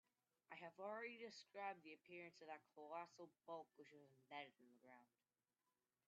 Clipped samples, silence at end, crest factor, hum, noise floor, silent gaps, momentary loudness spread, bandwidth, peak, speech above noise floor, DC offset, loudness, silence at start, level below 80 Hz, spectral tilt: under 0.1%; 1.05 s; 22 dB; none; under -90 dBFS; none; 12 LU; 7.4 kHz; -38 dBFS; over 32 dB; under 0.1%; -57 LUFS; 0.5 s; under -90 dBFS; -2 dB/octave